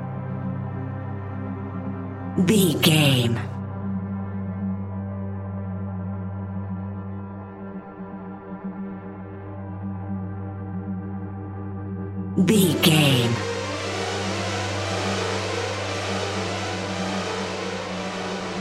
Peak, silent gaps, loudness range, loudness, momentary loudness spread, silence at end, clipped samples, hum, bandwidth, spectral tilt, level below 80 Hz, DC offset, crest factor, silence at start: -4 dBFS; none; 12 LU; -25 LUFS; 17 LU; 0 s; under 0.1%; none; 16 kHz; -5 dB/octave; -58 dBFS; under 0.1%; 22 dB; 0 s